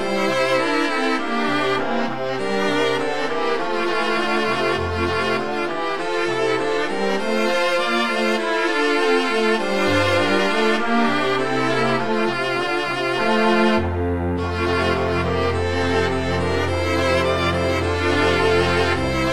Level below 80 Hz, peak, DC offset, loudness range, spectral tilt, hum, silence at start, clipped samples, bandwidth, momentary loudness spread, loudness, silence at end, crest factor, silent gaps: -42 dBFS; -4 dBFS; 2%; 3 LU; -5 dB/octave; none; 0 s; under 0.1%; 17.5 kHz; 5 LU; -20 LUFS; 0 s; 14 dB; none